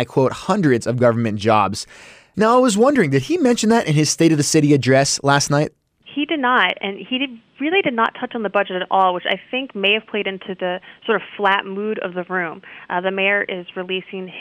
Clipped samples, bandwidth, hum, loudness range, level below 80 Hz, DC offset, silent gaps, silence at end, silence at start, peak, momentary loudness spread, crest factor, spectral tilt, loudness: under 0.1%; 15.5 kHz; none; 6 LU; -58 dBFS; under 0.1%; none; 0 s; 0 s; -4 dBFS; 11 LU; 16 dB; -4.5 dB/octave; -18 LUFS